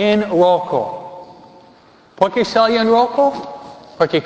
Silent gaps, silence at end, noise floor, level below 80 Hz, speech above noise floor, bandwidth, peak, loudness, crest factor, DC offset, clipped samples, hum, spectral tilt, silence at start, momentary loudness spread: none; 0 s; -47 dBFS; -56 dBFS; 33 dB; 8 kHz; 0 dBFS; -16 LUFS; 16 dB; under 0.1%; under 0.1%; none; -6 dB/octave; 0 s; 19 LU